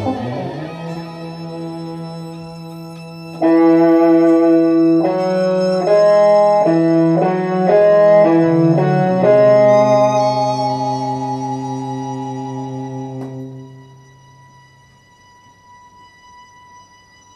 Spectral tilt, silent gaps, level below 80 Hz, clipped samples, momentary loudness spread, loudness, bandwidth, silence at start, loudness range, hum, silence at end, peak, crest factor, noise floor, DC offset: -7.5 dB/octave; none; -60 dBFS; under 0.1%; 19 LU; -13 LUFS; 8.4 kHz; 0 s; 16 LU; none; 3.55 s; 0 dBFS; 14 dB; -48 dBFS; under 0.1%